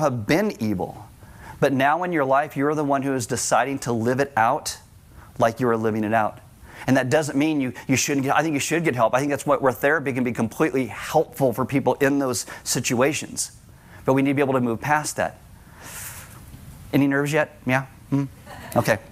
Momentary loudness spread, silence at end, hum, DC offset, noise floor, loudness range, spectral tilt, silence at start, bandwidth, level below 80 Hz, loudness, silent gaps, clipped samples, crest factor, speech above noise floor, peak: 12 LU; 0 s; none; under 0.1%; -47 dBFS; 3 LU; -5 dB/octave; 0 s; 16 kHz; -54 dBFS; -22 LUFS; none; under 0.1%; 18 dB; 25 dB; -4 dBFS